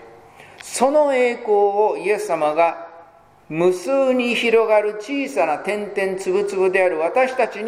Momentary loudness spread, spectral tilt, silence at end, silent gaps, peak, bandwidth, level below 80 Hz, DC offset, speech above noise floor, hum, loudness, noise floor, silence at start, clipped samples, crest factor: 7 LU; -4 dB/octave; 0 s; none; -2 dBFS; 15.5 kHz; -66 dBFS; under 0.1%; 29 dB; none; -19 LUFS; -47 dBFS; 0 s; under 0.1%; 18 dB